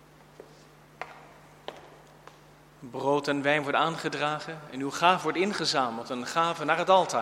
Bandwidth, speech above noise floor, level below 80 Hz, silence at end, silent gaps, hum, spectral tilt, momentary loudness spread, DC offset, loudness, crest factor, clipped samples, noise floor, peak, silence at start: 16 kHz; 27 dB; -68 dBFS; 0 s; none; none; -4 dB/octave; 20 LU; under 0.1%; -27 LUFS; 22 dB; under 0.1%; -54 dBFS; -6 dBFS; 1 s